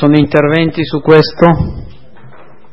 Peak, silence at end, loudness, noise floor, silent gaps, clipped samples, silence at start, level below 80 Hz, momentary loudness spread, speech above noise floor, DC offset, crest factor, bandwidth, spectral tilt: 0 dBFS; 0.85 s; -10 LUFS; -39 dBFS; none; 0.4%; 0 s; -32 dBFS; 9 LU; 30 dB; 3%; 12 dB; 5.8 kHz; -9 dB/octave